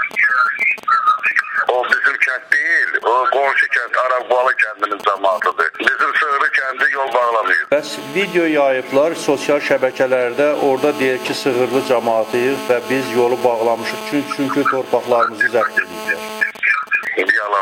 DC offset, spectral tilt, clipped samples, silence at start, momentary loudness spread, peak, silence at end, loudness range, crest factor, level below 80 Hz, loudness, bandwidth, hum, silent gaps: under 0.1%; -4 dB/octave; under 0.1%; 0 s; 5 LU; 0 dBFS; 0 s; 3 LU; 16 dB; -66 dBFS; -16 LUFS; 16.5 kHz; none; none